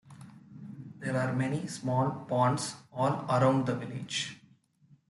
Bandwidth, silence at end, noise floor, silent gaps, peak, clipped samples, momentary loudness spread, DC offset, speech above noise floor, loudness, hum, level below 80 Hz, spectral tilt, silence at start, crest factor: 12 kHz; 0.75 s; -64 dBFS; none; -14 dBFS; under 0.1%; 20 LU; under 0.1%; 34 dB; -31 LUFS; none; -72 dBFS; -5.5 dB/octave; 0.05 s; 18 dB